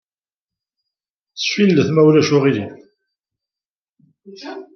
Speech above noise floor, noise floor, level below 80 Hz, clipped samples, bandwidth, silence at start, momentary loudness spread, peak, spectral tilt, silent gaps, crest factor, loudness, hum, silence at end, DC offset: over 75 dB; under -90 dBFS; -64 dBFS; under 0.1%; 6.6 kHz; 1.35 s; 21 LU; -2 dBFS; -6 dB/octave; 3.66-3.82 s, 3.89-3.93 s; 18 dB; -15 LUFS; none; 0.15 s; under 0.1%